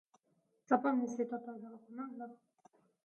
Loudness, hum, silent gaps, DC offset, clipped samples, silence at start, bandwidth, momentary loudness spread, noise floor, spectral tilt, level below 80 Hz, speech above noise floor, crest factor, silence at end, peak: -37 LUFS; none; none; under 0.1%; under 0.1%; 0.7 s; 7 kHz; 18 LU; -79 dBFS; -6.5 dB/octave; under -90 dBFS; 41 dB; 24 dB; 0.7 s; -16 dBFS